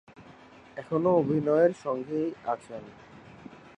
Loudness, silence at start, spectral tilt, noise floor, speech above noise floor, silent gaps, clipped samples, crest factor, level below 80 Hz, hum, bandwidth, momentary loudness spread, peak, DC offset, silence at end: -27 LUFS; 0.2 s; -8.5 dB/octave; -52 dBFS; 25 dB; none; under 0.1%; 18 dB; -68 dBFS; none; 9.2 kHz; 24 LU; -10 dBFS; under 0.1%; 0.2 s